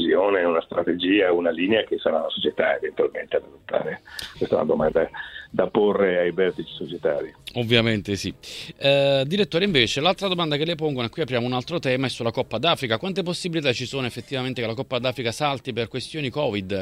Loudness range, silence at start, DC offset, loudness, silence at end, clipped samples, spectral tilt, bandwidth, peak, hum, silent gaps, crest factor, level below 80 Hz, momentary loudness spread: 4 LU; 0 s; under 0.1%; -23 LUFS; 0 s; under 0.1%; -5 dB/octave; 15.5 kHz; -2 dBFS; none; none; 20 dB; -54 dBFS; 9 LU